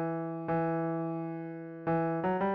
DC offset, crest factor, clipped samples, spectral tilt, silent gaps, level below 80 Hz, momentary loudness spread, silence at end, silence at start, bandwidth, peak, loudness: under 0.1%; 12 dB; under 0.1%; -8 dB/octave; none; -66 dBFS; 8 LU; 0 s; 0 s; 4.5 kHz; -20 dBFS; -33 LUFS